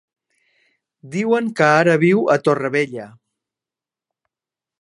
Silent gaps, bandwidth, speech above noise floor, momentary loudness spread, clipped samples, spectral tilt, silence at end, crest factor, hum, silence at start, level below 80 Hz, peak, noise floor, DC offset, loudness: none; 11.5 kHz; 72 dB; 12 LU; under 0.1%; -6.5 dB/octave; 1.75 s; 20 dB; none; 1.05 s; -70 dBFS; 0 dBFS; -89 dBFS; under 0.1%; -17 LUFS